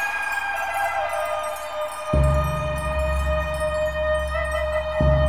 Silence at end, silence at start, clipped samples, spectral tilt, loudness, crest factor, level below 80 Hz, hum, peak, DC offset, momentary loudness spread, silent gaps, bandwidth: 0 s; 0 s; under 0.1%; -5.5 dB/octave; -24 LUFS; 16 dB; -28 dBFS; none; -8 dBFS; 0.7%; 6 LU; none; 16 kHz